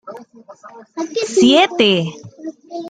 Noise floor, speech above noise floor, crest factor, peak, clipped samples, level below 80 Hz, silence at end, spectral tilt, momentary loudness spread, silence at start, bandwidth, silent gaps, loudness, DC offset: -36 dBFS; 21 dB; 16 dB; 0 dBFS; under 0.1%; -62 dBFS; 0 s; -4 dB/octave; 22 LU; 0.05 s; 9.4 kHz; none; -14 LUFS; under 0.1%